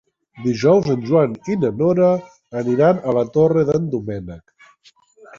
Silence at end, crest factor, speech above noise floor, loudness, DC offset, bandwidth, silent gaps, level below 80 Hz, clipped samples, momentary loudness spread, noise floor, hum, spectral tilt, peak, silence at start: 1 s; 16 dB; 36 dB; -18 LUFS; under 0.1%; 7.4 kHz; none; -52 dBFS; under 0.1%; 11 LU; -53 dBFS; none; -8 dB/octave; -2 dBFS; 0.35 s